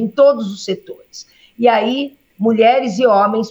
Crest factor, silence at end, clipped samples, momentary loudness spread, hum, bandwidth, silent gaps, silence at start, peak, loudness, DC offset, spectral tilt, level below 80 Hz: 14 dB; 0 s; under 0.1%; 21 LU; none; 7.8 kHz; none; 0 s; -2 dBFS; -15 LUFS; under 0.1%; -5.5 dB/octave; -66 dBFS